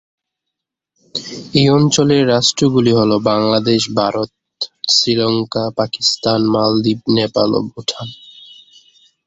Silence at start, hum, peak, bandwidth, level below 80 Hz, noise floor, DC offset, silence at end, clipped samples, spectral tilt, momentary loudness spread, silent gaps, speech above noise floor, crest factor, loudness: 1.15 s; none; 0 dBFS; 8.2 kHz; -52 dBFS; -80 dBFS; under 0.1%; 0.95 s; under 0.1%; -5 dB/octave; 13 LU; none; 66 dB; 16 dB; -15 LUFS